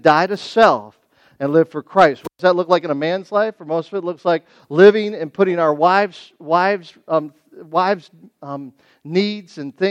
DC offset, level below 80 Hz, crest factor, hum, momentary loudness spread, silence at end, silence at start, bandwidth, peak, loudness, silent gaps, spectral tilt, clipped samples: under 0.1%; -66 dBFS; 18 dB; none; 12 LU; 0 s; 0.05 s; 9.2 kHz; 0 dBFS; -17 LUFS; none; -6.5 dB/octave; under 0.1%